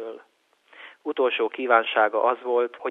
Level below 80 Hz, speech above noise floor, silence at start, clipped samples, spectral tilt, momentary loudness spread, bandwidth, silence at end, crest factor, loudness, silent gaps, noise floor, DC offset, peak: -82 dBFS; 40 dB; 0 s; under 0.1%; -4.5 dB/octave; 12 LU; 4 kHz; 0 s; 20 dB; -23 LUFS; none; -63 dBFS; under 0.1%; -4 dBFS